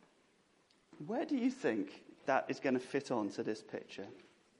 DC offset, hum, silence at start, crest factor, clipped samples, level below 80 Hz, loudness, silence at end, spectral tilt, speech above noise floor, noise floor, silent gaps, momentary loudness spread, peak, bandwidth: under 0.1%; none; 0.95 s; 22 dB; under 0.1%; -86 dBFS; -38 LUFS; 0.4 s; -5.5 dB/octave; 34 dB; -72 dBFS; none; 14 LU; -18 dBFS; 11 kHz